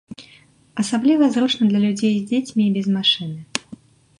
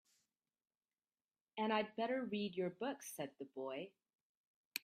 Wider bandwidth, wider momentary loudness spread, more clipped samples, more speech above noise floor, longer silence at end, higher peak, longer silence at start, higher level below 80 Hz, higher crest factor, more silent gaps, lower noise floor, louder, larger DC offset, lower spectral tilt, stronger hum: second, 11 kHz vs 14.5 kHz; about the same, 12 LU vs 10 LU; neither; second, 33 dB vs over 47 dB; first, 0.45 s vs 0.05 s; first, -2 dBFS vs -20 dBFS; second, 0.1 s vs 1.55 s; first, -64 dBFS vs under -90 dBFS; second, 18 dB vs 26 dB; second, none vs 4.21-4.71 s; second, -51 dBFS vs under -90 dBFS; first, -19 LUFS vs -43 LUFS; neither; about the same, -5 dB/octave vs -4.5 dB/octave; neither